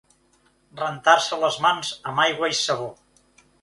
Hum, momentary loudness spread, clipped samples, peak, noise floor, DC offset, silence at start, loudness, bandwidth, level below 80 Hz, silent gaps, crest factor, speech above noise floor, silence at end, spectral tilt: none; 11 LU; under 0.1%; -2 dBFS; -62 dBFS; under 0.1%; 0.75 s; -22 LUFS; 11.5 kHz; -66 dBFS; none; 24 dB; 40 dB; 0.7 s; -2 dB/octave